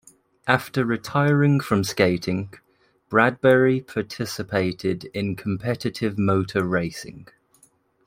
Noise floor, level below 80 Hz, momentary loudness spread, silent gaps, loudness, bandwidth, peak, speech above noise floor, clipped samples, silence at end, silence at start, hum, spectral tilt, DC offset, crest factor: -60 dBFS; -58 dBFS; 11 LU; none; -22 LUFS; 16 kHz; -2 dBFS; 38 dB; under 0.1%; 0.85 s; 0.45 s; none; -6.5 dB/octave; under 0.1%; 22 dB